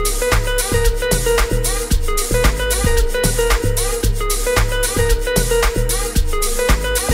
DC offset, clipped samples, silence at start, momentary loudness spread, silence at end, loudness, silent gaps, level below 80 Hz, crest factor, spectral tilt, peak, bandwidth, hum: under 0.1%; under 0.1%; 0 s; 3 LU; 0 s; -17 LUFS; none; -18 dBFS; 16 dB; -3.5 dB/octave; 0 dBFS; 16.5 kHz; none